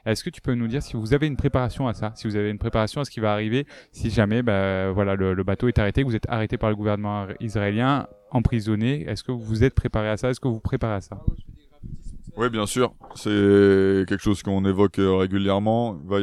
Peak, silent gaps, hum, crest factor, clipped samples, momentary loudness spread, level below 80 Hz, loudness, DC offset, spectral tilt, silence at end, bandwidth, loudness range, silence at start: -4 dBFS; none; none; 18 dB; under 0.1%; 8 LU; -38 dBFS; -23 LUFS; under 0.1%; -7 dB/octave; 0 s; 13 kHz; 6 LU; 0.05 s